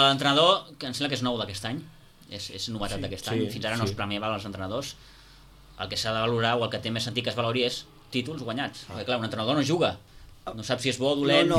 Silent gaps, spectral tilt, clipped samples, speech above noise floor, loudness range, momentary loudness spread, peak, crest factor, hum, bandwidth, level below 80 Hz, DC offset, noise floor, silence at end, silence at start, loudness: none; -4.5 dB/octave; under 0.1%; 25 dB; 4 LU; 15 LU; -6 dBFS; 22 dB; none; 16 kHz; -54 dBFS; under 0.1%; -52 dBFS; 0 s; 0 s; -27 LUFS